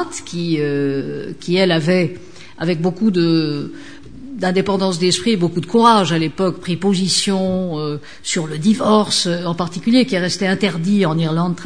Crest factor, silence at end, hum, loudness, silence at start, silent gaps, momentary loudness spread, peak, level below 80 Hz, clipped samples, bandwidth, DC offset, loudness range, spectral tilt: 18 dB; 0 s; none; -17 LUFS; 0 s; none; 11 LU; 0 dBFS; -54 dBFS; under 0.1%; 10 kHz; 1%; 3 LU; -5 dB/octave